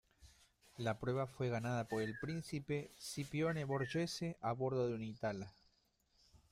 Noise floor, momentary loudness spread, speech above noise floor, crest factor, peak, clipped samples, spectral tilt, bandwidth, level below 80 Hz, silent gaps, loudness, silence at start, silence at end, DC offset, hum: -78 dBFS; 6 LU; 37 dB; 16 dB; -26 dBFS; under 0.1%; -6 dB/octave; 15.5 kHz; -70 dBFS; none; -41 LUFS; 0.2 s; 0.15 s; under 0.1%; none